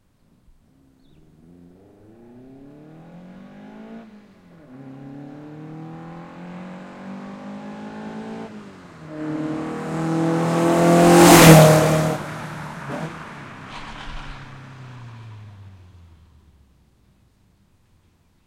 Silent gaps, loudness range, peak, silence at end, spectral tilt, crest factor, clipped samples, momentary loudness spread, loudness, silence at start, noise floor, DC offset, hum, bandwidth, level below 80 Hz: none; 25 LU; 0 dBFS; 3.1 s; -5 dB/octave; 22 dB; under 0.1%; 29 LU; -15 LUFS; 3.8 s; -59 dBFS; under 0.1%; none; 16.5 kHz; -46 dBFS